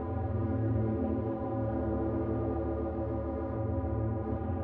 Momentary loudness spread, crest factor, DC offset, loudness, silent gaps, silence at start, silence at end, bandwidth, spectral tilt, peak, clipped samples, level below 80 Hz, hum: 3 LU; 12 dB; under 0.1%; -33 LUFS; none; 0 s; 0 s; 3.4 kHz; -11 dB/octave; -20 dBFS; under 0.1%; -42 dBFS; none